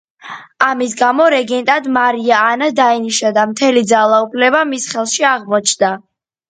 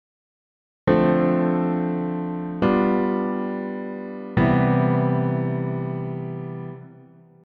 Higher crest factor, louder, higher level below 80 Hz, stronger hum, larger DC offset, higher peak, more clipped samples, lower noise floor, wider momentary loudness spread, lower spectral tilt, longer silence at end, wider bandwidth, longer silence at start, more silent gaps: second, 14 dB vs 20 dB; first, -13 LUFS vs -23 LUFS; second, -64 dBFS vs -48 dBFS; neither; neither; first, 0 dBFS vs -4 dBFS; neither; second, -33 dBFS vs -49 dBFS; second, 6 LU vs 13 LU; second, -2.5 dB/octave vs -11 dB/octave; about the same, 0.5 s vs 0.5 s; first, 9.6 kHz vs 5 kHz; second, 0.25 s vs 0.85 s; neither